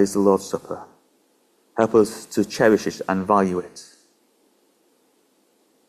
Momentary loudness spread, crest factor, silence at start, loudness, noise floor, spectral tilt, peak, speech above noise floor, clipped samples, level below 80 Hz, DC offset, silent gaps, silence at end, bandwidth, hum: 17 LU; 20 dB; 0 s; -21 LUFS; -63 dBFS; -5.5 dB/octave; -4 dBFS; 43 dB; under 0.1%; -58 dBFS; under 0.1%; none; 2.05 s; 15 kHz; none